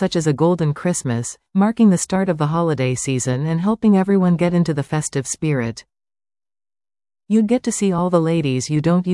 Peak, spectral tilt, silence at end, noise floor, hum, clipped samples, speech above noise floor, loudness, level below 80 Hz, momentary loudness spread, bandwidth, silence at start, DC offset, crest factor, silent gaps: -4 dBFS; -6 dB/octave; 0 s; under -90 dBFS; none; under 0.1%; over 72 dB; -18 LUFS; -52 dBFS; 7 LU; 12 kHz; 0 s; under 0.1%; 16 dB; none